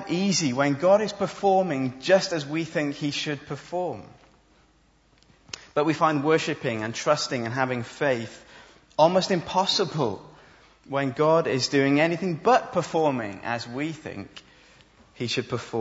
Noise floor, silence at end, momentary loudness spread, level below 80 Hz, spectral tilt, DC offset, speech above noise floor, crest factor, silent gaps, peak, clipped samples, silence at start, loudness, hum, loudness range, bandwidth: -61 dBFS; 0 s; 12 LU; -64 dBFS; -4.5 dB/octave; under 0.1%; 37 dB; 20 dB; none; -6 dBFS; under 0.1%; 0 s; -25 LUFS; none; 6 LU; 8 kHz